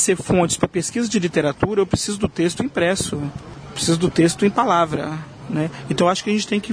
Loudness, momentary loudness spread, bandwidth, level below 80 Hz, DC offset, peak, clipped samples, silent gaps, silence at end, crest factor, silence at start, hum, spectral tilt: -20 LUFS; 10 LU; 11 kHz; -44 dBFS; under 0.1%; -4 dBFS; under 0.1%; none; 0 s; 16 dB; 0 s; none; -4.5 dB/octave